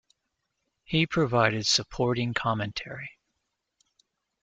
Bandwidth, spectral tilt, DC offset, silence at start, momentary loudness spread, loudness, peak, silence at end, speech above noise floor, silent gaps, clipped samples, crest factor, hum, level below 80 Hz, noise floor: 9.4 kHz; -4 dB/octave; under 0.1%; 0.9 s; 14 LU; -26 LUFS; -6 dBFS; 1.35 s; 54 dB; none; under 0.1%; 24 dB; none; -56 dBFS; -81 dBFS